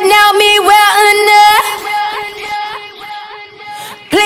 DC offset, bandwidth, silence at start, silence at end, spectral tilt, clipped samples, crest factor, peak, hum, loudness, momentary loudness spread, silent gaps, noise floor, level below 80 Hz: under 0.1%; 17 kHz; 0 s; 0 s; -0.5 dB/octave; 0.1%; 10 dB; 0 dBFS; none; -8 LUFS; 21 LU; none; -29 dBFS; -48 dBFS